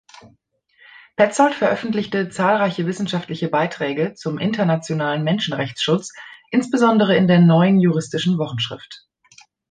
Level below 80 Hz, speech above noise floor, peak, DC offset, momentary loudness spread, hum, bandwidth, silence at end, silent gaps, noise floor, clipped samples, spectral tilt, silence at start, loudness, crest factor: -62 dBFS; 42 dB; -2 dBFS; under 0.1%; 10 LU; none; 9.4 kHz; 0.75 s; none; -61 dBFS; under 0.1%; -6 dB/octave; 1.2 s; -19 LUFS; 18 dB